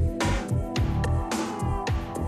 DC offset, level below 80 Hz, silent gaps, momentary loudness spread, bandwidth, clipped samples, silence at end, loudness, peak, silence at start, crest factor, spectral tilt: under 0.1%; -32 dBFS; none; 3 LU; 13.5 kHz; under 0.1%; 0 s; -28 LUFS; -14 dBFS; 0 s; 12 dB; -6 dB/octave